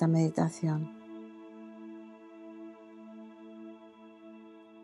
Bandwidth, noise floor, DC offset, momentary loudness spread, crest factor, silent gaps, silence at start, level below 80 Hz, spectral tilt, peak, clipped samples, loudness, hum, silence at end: 11 kHz; -53 dBFS; under 0.1%; 22 LU; 22 dB; none; 0 s; -82 dBFS; -8 dB/octave; -14 dBFS; under 0.1%; -32 LUFS; none; 0.3 s